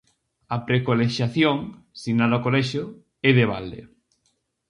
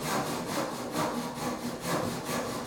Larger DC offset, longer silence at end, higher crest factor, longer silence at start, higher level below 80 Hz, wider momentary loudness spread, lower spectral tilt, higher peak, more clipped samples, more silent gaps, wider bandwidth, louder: neither; first, 0.85 s vs 0 s; first, 22 dB vs 16 dB; first, 0.5 s vs 0 s; about the same, -56 dBFS vs -58 dBFS; first, 17 LU vs 3 LU; first, -7 dB/octave vs -4 dB/octave; first, -2 dBFS vs -16 dBFS; neither; neither; second, 11 kHz vs 17.5 kHz; first, -22 LUFS vs -33 LUFS